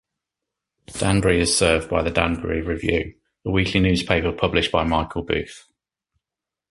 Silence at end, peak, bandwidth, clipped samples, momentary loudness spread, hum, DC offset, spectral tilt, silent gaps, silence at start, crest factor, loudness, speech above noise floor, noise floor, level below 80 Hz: 1.15 s; 0 dBFS; 11.5 kHz; under 0.1%; 8 LU; none; under 0.1%; -4.5 dB/octave; none; 0.9 s; 22 dB; -21 LUFS; 67 dB; -87 dBFS; -36 dBFS